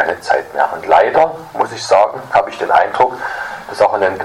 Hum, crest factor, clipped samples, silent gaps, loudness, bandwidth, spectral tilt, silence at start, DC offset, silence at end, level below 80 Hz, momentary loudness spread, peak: none; 14 dB; under 0.1%; none; -14 LUFS; 15.5 kHz; -3.5 dB/octave; 0 s; under 0.1%; 0 s; -52 dBFS; 9 LU; 0 dBFS